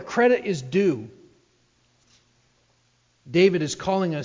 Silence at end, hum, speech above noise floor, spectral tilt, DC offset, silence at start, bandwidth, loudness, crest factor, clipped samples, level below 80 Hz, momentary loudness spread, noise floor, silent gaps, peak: 0 s; 60 Hz at -70 dBFS; 43 dB; -5.5 dB/octave; under 0.1%; 0 s; 7.6 kHz; -22 LUFS; 18 dB; under 0.1%; -62 dBFS; 7 LU; -65 dBFS; none; -6 dBFS